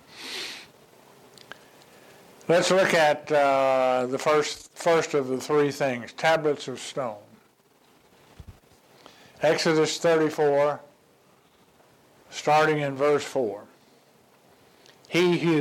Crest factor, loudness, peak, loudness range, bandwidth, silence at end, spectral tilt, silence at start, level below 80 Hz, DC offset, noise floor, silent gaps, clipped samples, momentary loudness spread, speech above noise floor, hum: 16 dB; -24 LUFS; -10 dBFS; 6 LU; 16.5 kHz; 0 s; -4.5 dB/octave; 0.15 s; -66 dBFS; under 0.1%; -61 dBFS; none; under 0.1%; 13 LU; 37 dB; none